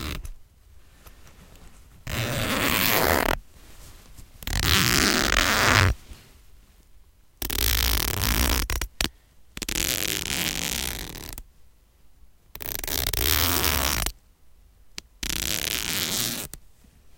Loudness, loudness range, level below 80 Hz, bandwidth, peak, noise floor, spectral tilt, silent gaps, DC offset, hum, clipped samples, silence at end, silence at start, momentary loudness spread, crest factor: -23 LUFS; 6 LU; -36 dBFS; 17.5 kHz; 0 dBFS; -54 dBFS; -2.5 dB/octave; none; under 0.1%; none; under 0.1%; 0.05 s; 0 s; 17 LU; 26 dB